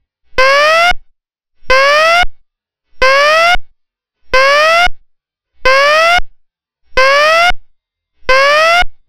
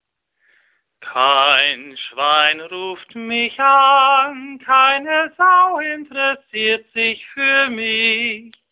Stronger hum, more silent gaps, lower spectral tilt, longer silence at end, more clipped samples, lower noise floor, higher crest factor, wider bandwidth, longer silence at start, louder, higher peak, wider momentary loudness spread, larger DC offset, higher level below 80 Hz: neither; neither; second, -1 dB/octave vs -5 dB/octave; about the same, 0.15 s vs 0.25 s; first, 4% vs under 0.1%; about the same, -65 dBFS vs -64 dBFS; second, 10 dB vs 16 dB; first, 5.4 kHz vs 4 kHz; second, 0.35 s vs 1 s; first, -9 LUFS vs -15 LUFS; about the same, 0 dBFS vs 0 dBFS; second, 9 LU vs 14 LU; neither; first, -28 dBFS vs -66 dBFS